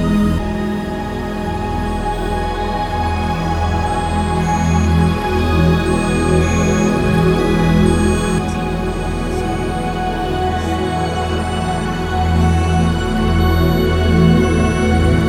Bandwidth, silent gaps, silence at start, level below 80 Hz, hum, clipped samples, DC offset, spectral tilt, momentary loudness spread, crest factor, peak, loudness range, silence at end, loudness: 14 kHz; none; 0 s; -26 dBFS; none; under 0.1%; under 0.1%; -6.5 dB/octave; 7 LU; 14 dB; 0 dBFS; 5 LU; 0 s; -16 LUFS